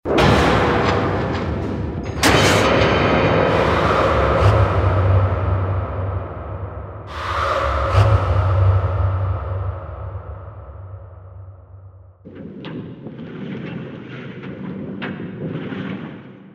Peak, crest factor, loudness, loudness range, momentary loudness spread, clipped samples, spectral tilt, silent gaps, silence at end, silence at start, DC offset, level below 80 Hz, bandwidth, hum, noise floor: 0 dBFS; 18 dB; -18 LUFS; 18 LU; 19 LU; under 0.1%; -6 dB/octave; none; 0.1 s; 0.05 s; under 0.1%; -30 dBFS; 14 kHz; none; -42 dBFS